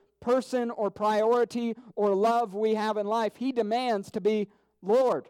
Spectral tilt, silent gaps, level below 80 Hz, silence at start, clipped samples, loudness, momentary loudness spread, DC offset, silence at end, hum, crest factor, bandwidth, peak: -5.5 dB/octave; none; -72 dBFS; 0.2 s; under 0.1%; -27 LUFS; 7 LU; under 0.1%; 0.05 s; none; 12 dB; 15 kHz; -14 dBFS